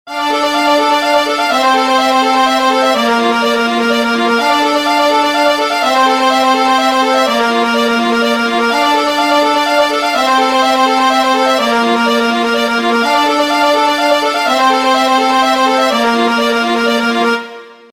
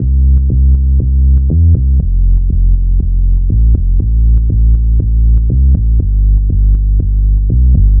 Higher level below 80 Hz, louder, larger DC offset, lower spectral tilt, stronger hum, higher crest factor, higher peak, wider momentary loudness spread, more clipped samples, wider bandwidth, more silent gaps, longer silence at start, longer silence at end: second, -54 dBFS vs -8 dBFS; about the same, -11 LUFS vs -12 LUFS; neither; second, -2 dB/octave vs -16.5 dB/octave; neither; about the same, 12 dB vs 8 dB; about the same, 0 dBFS vs 0 dBFS; about the same, 2 LU vs 3 LU; neither; first, 16.5 kHz vs 0.7 kHz; neither; about the same, 0.05 s vs 0 s; first, 0.2 s vs 0 s